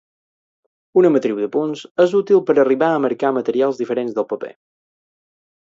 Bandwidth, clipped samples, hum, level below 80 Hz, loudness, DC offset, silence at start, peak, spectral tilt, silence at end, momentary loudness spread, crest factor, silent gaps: 7.6 kHz; under 0.1%; none; -70 dBFS; -18 LUFS; under 0.1%; 0.95 s; -2 dBFS; -7 dB/octave; 1.1 s; 9 LU; 16 dB; 1.91-1.95 s